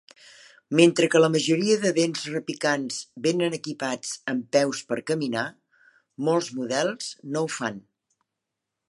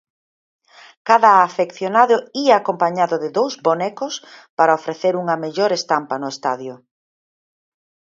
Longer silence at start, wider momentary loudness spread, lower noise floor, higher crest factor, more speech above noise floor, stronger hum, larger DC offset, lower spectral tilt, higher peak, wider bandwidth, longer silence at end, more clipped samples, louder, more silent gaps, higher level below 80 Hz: second, 0.7 s vs 1.05 s; second, 11 LU vs 14 LU; second, -84 dBFS vs under -90 dBFS; first, 24 dB vs 18 dB; second, 60 dB vs over 73 dB; neither; neither; about the same, -4.5 dB/octave vs -4.5 dB/octave; about the same, -2 dBFS vs 0 dBFS; first, 11.5 kHz vs 7.8 kHz; second, 1.1 s vs 1.3 s; neither; second, -25 LUFS vs -18 LUFS; second, none vs 4.50-4.57 s; about the same, -76 dBFS vs -72 dBFS